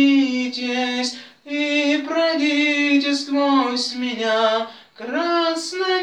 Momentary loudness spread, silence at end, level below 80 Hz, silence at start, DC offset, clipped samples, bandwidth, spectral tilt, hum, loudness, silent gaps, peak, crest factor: 8 LU; 0 s; -80 dBFS; 0 s; under 0.1%; under 0.1%; 10 kHz; -2 dB/octave; none; -20 LUFS; none; -6 dBFS; 14 dB